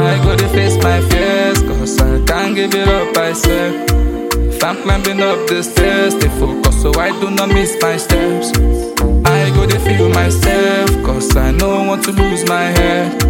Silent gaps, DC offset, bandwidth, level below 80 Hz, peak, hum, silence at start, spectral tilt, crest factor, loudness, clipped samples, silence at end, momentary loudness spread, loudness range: none; under 0.1%; 17 kHz; -18 dBFS; 0 dBFS; none; 0 s; -5 dB/octave; 12 dB; -13 LUFS; under 0.1%; 0 s; 3 LU; 2 LU